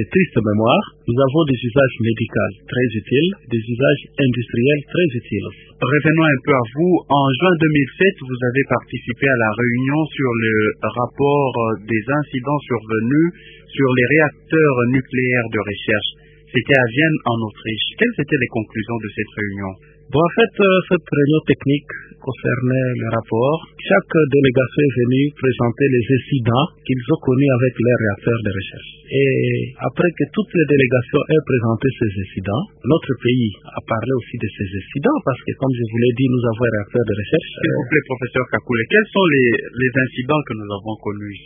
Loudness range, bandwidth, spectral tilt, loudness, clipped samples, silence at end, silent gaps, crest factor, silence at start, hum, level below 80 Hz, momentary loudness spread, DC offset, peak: 3 LU; 3.8 kHz; -10.5 dB/octave; -18 LUFS; under 0.1%; 0.05 s; none; 18 dB; 0 s; none; -46 dBFS; 9 LU; under 0.1%; 0 dBFS